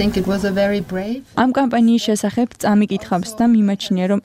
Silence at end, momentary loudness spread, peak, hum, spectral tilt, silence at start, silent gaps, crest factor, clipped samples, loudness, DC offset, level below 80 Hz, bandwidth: 0.05 s; 7 LU; -4 dBFS; none; -6 dB/octave; 0 s; none; 12 dB; under 0.1%; -18 LUFS; under 0.1%; -44 dBFS; 15.5 kHz